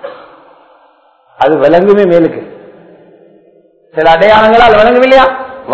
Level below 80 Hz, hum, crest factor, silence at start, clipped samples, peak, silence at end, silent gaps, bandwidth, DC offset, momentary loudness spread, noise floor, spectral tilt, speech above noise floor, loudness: -38 dBFS; none; 10 dB; 0.05 s; 3%; 0 dBFS; 0 s; none; 8 kHz; under 0.1%; 16 LU; -47 dBFS; -6.5 dB/octave; 41 dB; -6 LUFS